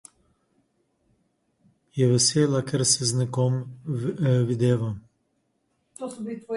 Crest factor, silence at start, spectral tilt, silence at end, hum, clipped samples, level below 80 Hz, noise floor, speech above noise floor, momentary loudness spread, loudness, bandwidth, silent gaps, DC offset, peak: 18 dB; 1.95 s; -5 dB/octave; 0 s; none; under 0.1%; -62 dBFS; -72 dBFS; 49 dB; 16 LU; -23 LUFS; 11.5 kHz; none; under 0.1%; -8 dBFS